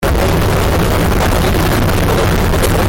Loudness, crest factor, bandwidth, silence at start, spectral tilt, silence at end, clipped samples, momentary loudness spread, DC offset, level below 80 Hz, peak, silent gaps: -13 LUFS; 8 dB; 17 kHz; 0 s; -5.5 dB/octave; 0 s; under 0.1%; 0 LU; under 0.1%; -18 dBFS; -2 dBFS; none